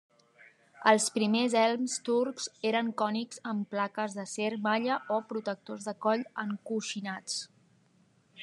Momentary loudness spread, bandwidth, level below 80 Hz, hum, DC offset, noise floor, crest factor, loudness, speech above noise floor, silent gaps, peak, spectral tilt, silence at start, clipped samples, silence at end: 11 LU; 12.5 kHz; under -90 dBFS; none; under 0.1%; -67 dBFS; 24 dB; -31 LUFS; 36 dB; none; -8 dBFS; -3.5 dB/octave; 0.75 s; under 0.1%; 0 s